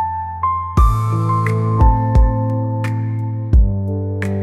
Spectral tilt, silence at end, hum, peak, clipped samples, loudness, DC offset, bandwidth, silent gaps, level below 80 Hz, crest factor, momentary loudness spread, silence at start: -9 dB/octave; 0 s; none; -2 dBFS; under 0.1%; -17 LUFS; 0.1%; 11 kHz; none; -18 dBFS; 14 dB; 7 LU; 0 s